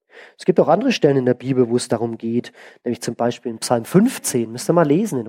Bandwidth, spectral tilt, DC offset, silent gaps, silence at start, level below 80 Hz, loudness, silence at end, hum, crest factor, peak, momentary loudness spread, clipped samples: 16.5 kHz; -5.5 dB/octave; under 0.1%; none; 0.15 s; -66 dBFS; -19 LUFS; 0 s; none; 18 dB; -2 dBFS; 9 LU; under 0.1%